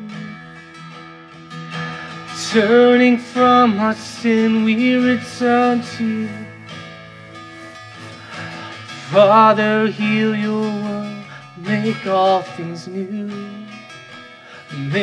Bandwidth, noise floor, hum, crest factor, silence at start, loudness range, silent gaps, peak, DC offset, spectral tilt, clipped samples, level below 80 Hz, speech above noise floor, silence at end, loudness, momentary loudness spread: 11 kHz; -39 dBFS; none; 16 dB; 0 s; 8 LU; none; -2 dBFS; under 0.1%; -5.5 dB/octave; under 0.1%; -62 dBFS; 24 dB; 0 s; -16 LUFS; 24 LU